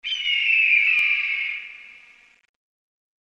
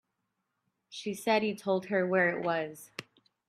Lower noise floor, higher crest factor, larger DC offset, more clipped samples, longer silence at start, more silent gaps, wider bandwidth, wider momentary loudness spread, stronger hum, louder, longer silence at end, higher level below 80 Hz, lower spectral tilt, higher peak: second, -52 dBFS vs -82 dBFS; about the same, 16 dB vs 20 dB; neither; neither; second, 0.05 s vs 0.9 s; neither; second, 9.2 kHz vs 15.5 kHz; second, 14 LU vs 18 LU; neither; first, -18 LUFS vs -30 LUFS; first, 1.3 s vs 0.45 s; first, -68 dBFS vs -80 dBFS; second, 3 dB/octave vs -5 dB/octave; first, -8 dBFS vs -14 dBFS